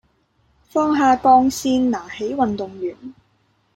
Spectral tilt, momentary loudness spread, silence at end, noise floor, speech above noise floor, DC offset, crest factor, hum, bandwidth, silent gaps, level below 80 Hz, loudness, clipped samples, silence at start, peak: -4.5 dB/octave; 15 LU; 0.65 s; -63 dBFS; 45 dB; under 0.1%; 18 dB; none; 16.5 kHz; none; -52 dBFS; -19 LUFS; under 0.1%; 0.75 s; -2 dBFS